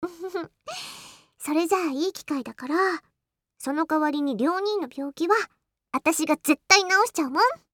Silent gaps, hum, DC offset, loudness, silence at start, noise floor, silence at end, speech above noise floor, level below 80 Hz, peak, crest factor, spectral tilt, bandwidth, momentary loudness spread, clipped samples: none; none; under 0.1%; -24 LUFS; 0 s; -81 dBFS; 0.15 s; 57 dB; -72 dBFS; -4 dBFS; 22 dB; -2 dB/octave; 19 kHz; 16 LU; under 0.1%